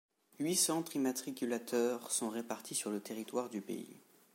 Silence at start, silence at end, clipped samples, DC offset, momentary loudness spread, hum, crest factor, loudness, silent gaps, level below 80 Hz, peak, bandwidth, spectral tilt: 0.4 s; 0.35 s; under 0.1%; under 0.1%; 11 LU; none; 18 dB; -37 LUFS; none; under -90 dBFS; -20 dBFS; 16.5 kHz; -3 dB/octave